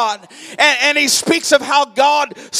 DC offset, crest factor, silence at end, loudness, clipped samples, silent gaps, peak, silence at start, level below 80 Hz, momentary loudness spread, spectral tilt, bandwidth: under 0.1%; 14 dB; 0 s; -13 LUFS; under 0.1%; none; 0 dBFS; 0 s; -64 dBFS; 9 LU; -1 dB/octave; 15.5 kHz